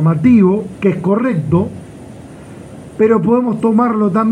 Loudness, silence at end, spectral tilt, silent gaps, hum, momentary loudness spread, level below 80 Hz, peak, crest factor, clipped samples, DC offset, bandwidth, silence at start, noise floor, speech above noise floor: -13 LUFS; 0 s; -9.5 dB/octave; none; none; 24 LU; -48 dBFS; 0 dBFS; 12 dB; under 0.1%; under 0.1%; 10 kHz; 0 s; -33 dBFS; 21 dB